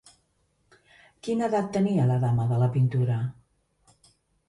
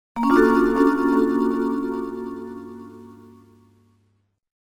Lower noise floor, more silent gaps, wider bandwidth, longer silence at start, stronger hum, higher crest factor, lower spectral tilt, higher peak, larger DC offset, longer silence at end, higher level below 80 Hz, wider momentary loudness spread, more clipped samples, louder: first, -70 dBFS vs -66 dBFS; neither; second, 11 kHz vs 18 kHz; first, 1.25 s vs 0.15 s; second, none vs 50 Hz at -55 dBFS; about the same, 14 dB vs 18 dB; first, -8.5 dB/octave vs -6.5 dB/octave; second, -14 dBFS vs -4 dBFS; neither; second, 1.15 s vs 1.6 s; second, -60 dBFS vs -50 dBFS; second, 7 LU vs 21 LU; neither; second, -25 LUFS vs -20 LUFS